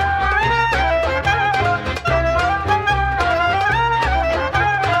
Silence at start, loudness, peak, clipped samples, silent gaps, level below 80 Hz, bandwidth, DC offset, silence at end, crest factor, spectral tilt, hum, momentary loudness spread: 0 s; -17 LUFS; -6 dBFS; under 0.1%; none; -28 dBFS; 14 kHz; under 0.1%; 0 s; 12 dB; -5 dB/octave; none; 2 LU